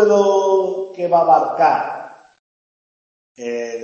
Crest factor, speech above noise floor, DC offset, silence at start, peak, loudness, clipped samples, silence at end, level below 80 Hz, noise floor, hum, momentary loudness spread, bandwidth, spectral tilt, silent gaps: 16 dB; over 74 dB; under 0.1%; 0 s; -2 dBFS; -16 LUFS; under 0.1%; 0 s; -72 dBFS; under -90 dBFS; none; 14 LU; 7.2 kHz; -5 dB/octave; 2.39-3.35 s